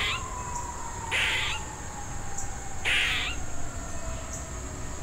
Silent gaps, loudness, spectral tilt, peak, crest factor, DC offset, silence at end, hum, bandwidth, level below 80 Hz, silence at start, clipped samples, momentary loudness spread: none; -30 LUFS; -2 dB/octave; -12 dBFS; 18 dB; under 0.1%; 0 s; none; 16 kHz; -40 dBFS; 0 s; under 0.1%; 13 LU